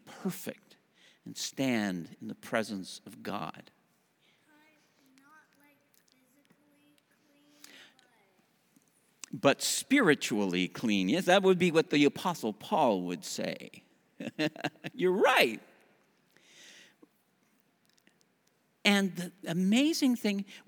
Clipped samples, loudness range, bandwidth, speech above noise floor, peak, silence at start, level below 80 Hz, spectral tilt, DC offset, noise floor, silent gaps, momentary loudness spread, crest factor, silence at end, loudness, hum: under 0.1%; 13 LU; over 20 kHz; 42 dB; -8 dBFS; 0.05 s; -84 dBFS; -4 dB/octave; under 0.1%; -72 dBFS; none; 18 LU; 24 dB; 0.1 s; -29 LUFS; none